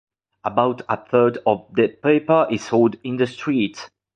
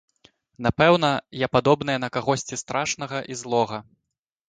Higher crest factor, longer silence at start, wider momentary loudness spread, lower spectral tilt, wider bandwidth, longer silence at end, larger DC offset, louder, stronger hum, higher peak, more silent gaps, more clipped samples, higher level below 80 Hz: about the same, 18 dB vs 22 dB; second, 0.45 s vs 0.6 s; about the same, 8 LU vs 10 LU; first, -6.5 dB/octave vs -4.5 dB/octave; about the same, 9 kHz vs 9.6 kHz; second, 0.3 s vs 0.65 s; neither; first, -20 LUFS vs -23 LUFS; neither; about the same, -2 dBFS vs -2 dBFS; neither; neither; second, -62 dBFS vs -52 dBFS